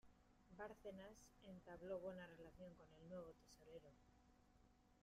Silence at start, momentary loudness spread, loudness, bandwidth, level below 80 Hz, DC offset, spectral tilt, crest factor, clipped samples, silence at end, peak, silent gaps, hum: 0.05 s; 13 LU; -59 LUFS; 15 kHz; -76 dBFS; under 0.1%; -6 dB/octave; 20 dB; under 0.1%; 0 s; -40 dBFS; none; none